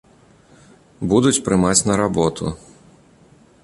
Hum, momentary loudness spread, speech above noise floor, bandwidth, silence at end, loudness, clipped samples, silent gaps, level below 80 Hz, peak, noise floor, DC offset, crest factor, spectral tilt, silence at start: none; 13 LU; 33 dB; 11.5 kHz; 1.05 s; -18 LUFS; under 0.1%; none; -44 dBFS; -2 dBFS; -51 dBFS; under 0.1%; 20 dB; -4.5 dB/octave; 1 s